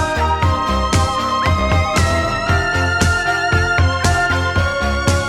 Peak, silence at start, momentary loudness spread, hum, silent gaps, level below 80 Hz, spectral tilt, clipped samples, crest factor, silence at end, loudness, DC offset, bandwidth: 0 dBFS; 0 s; 2 LU; none; none; -24 dBFS; -4.5 dB/octave; under 0.1%; 16 dB; 0 s; -16 LUFS; 0.1%; 14 kHz